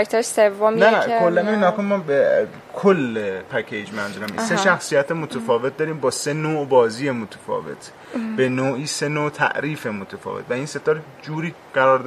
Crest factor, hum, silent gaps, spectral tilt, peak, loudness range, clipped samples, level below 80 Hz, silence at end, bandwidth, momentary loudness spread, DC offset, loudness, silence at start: 20 dB; none; none; -5 dB/octave; 0 dBFS; 5 LU; under 0.1%; -64 dBFS; 0 s; 15 kHz; 11 LU; under 0.1%; -21 LUFS; 0 s